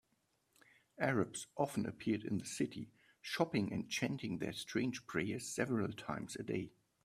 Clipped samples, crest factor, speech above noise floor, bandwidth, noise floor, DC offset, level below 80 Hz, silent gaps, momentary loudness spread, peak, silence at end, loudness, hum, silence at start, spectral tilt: under 0.1%; 22 dB; 41 dB; 15 kHz; -80 dBFS; under 0.1%; -72 dBFS; none; 8 LU; -18 dBFS; 0.35 s; -40 LUFS; none; 1 s; -5 dB/octave